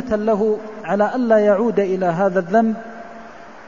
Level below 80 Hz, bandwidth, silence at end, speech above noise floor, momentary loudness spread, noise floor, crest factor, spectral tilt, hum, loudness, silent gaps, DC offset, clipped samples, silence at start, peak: -54 dBFS; 7.4 kHz; 0 s; 22 dB; 21 LU; -39 dBFS; 16 dB; -8 dB/octave; none; -18 LUFS; none; 0.6%; under 0.1%; 0 s; -2 dBFS